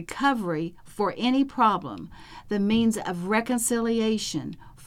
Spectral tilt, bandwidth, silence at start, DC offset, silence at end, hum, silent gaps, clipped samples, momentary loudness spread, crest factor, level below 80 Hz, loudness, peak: -4.5 dB/octave; 16.5 kHz; 0 s; under 0.1%; 0 s; none; none; under 0.1%; 12 LU; 16 dB; -54 dBFS; -25 LUFS; -10 dBFS